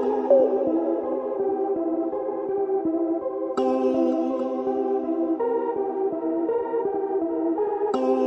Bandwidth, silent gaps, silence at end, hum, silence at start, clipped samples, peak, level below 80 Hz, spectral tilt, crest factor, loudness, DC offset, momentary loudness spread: 8 kHz; none; 0 s; none; 0 s; under 0.1%; -6 dBFS; -66 dBFS; -7.5 dB/octave; 16 dB; -24 LUFS; under 0.1%; 5 LU